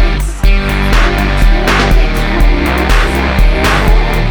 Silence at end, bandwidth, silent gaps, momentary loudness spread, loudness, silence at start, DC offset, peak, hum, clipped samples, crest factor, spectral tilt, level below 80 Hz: 0 s; 19 kHz; none; 3 LU; -12 LUFS; 0 s; under 0.1%; 0 dBFS; none; under 0.1%; 8 dB; -5.5 dB/octave; -10 dBFS